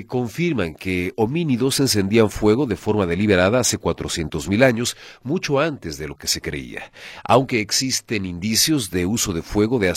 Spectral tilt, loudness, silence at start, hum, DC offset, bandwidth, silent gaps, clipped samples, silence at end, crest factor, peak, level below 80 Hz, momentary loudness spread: -4 dB/octave; -20 LUFS; 0 s; none; under 0.1%; 16.5 kHz; none; under 0.1%; 0 s; 20 dB; 0 dBFS; -44 dBFS; 10 LU